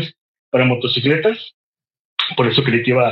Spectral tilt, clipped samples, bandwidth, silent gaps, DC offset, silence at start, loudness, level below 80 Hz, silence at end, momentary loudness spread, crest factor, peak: -8 dB/octave; under 0.1%; 5.8 kHz; 0.21-0.52 s, 1.54-1.73 s, 1.99-2.17 s; under 0.1%; 0 s; -17 LUFS; -58 dBFS; 0 s; 13 LU; 16 dB; -2 dBFS